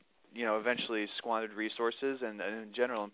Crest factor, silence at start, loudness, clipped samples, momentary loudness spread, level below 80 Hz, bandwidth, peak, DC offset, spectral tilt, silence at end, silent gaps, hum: 18 dB; 0.35 s; -35 LUFS; under 0.1%; 6 LU; -84 dBFS; 4 kHz; -16 dBFS; under 0.1%; -1 dB/octave; 0.05 s; none; none